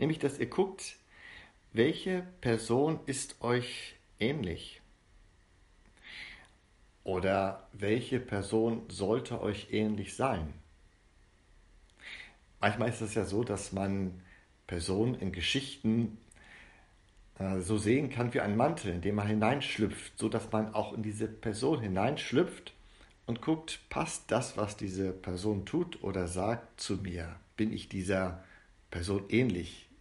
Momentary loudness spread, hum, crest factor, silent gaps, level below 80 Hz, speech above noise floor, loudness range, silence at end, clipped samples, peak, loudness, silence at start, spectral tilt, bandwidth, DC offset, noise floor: 16 LU; none; 22 dB; none; -56 dBFS; 31 dB; 5 LU; 0.15 s; under 0.1%; -12 dBFS; -33 LUFS; 0 s; -5.5 dB/octave; 11.5 kHz; under 0.1%; -64 dBFS